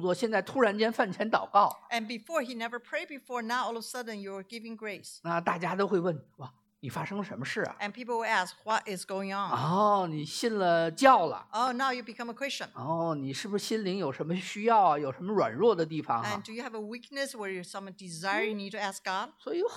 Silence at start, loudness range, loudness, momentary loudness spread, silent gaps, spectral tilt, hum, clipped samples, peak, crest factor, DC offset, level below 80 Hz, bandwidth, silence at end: 0 s; 7 LU; -30 LUFS; 14 LU; none; -4.5 dB/octave; none; under 0.1%; -8 dBFS; 22 dB; under 0.1%; -80 dBFS; 16.5 kHz; 0 s